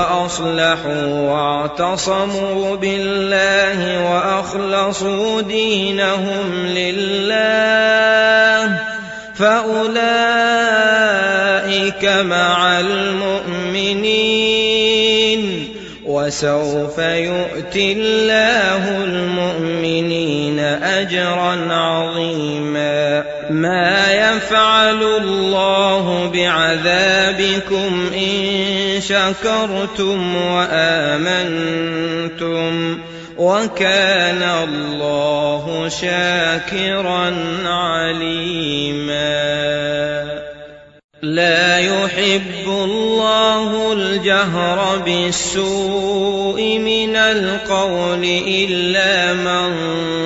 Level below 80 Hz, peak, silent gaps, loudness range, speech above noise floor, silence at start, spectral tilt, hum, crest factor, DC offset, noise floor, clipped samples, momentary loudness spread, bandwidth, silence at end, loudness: -48 dBFS; -2 dBFS; 41.04-41.09 s; 4 LU; 22 dB; 0 s; -4 dB/octave; none; 14 dB; under 0.1%; -38 dBFS; under 0.1%; 7 LU; 8.2 kHz; 0 s; -15 LUFS